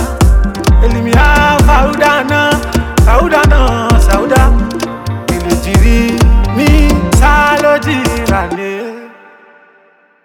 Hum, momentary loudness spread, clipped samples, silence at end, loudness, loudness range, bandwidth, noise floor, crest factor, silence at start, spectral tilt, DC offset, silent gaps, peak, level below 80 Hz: none; 10 LU; under 0.1%; 1.15 s; -10 LUFS; 2 LU; 16.5 kHz; -48 dBFS; 10 dB; 0 s; -5.5 dB/octave; under 0.1%; none; 0 dBFS; -12 dBFS